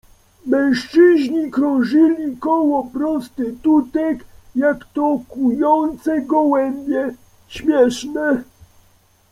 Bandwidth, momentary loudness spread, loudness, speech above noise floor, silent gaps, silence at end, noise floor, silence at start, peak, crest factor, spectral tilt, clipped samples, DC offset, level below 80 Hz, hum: 12.5 kHz; 9 LU; -18 LUFS; 38 dB; none; 0.9 s; -55 dBFS; 0.45 s; -2 dBFS; 16 dB; -5.5 dB/octave; under 0.1%; under 0.1%; -52 dBFS; none